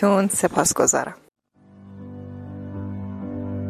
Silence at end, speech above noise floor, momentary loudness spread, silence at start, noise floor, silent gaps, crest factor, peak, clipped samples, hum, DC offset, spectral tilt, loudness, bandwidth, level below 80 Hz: 0 s; 30 dB; 20 LU; 0 s; -50 dBFS; none; 20 dB; -4 dBFS; under 0.1%; none; under 0.1%; -4 dB/octave; -22 LUFS; 16 kHz; -48 dBFS